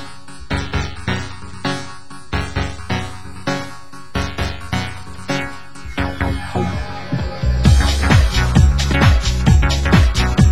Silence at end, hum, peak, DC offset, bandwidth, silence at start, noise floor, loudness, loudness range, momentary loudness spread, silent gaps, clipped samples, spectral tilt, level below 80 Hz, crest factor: 0 s; none; 0 dBFS; 3%; 16 kHz; 0 s; -36 dBFS; -18 LUFS; 10 LU; 15 LU; none; under 0.1%; -5.5 dB/octave; -20 dBFS; 18 dB